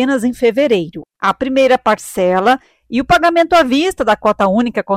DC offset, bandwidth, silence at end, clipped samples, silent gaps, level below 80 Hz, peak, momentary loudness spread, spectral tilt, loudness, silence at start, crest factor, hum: under 0.1%; 16 kHz; 0 s; under 0.1%; none; -42 dBFS; -4 dBFS; 7 LU; -5 dB/octave; -14 LUFS; 0 s; 10 dB; none